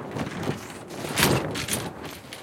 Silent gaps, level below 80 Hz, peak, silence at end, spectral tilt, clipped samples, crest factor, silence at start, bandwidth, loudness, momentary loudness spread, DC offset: none; -50 dBFS; -2 dBFS; 0 s; -3.5 dB/octave; under 0.1%; 26 dB; 0 s; 17 kHz; -27 LUFS; 16 LU; under 0.1%